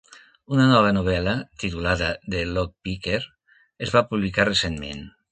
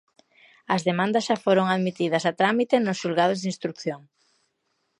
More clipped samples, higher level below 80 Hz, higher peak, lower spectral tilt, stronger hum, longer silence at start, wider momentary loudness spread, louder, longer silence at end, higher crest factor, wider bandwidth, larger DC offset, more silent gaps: neither; first, -40 dBFS vs -74 dBFS; about the same, -4 dBFS vs -6 dBFS; about the same, -5.5 dB/octave vs -5.5 dB/octave; neither; second, 0.15 s vs 0.7 s; first, 14 LU vs 9 LU; about the same, -23 LUFS vs -24 LUFS; second, 0.2 s vs 1 s; about the same, 20 dB vs 20 dB; second, 9.4 kHz vs 11 kHz; neither; neither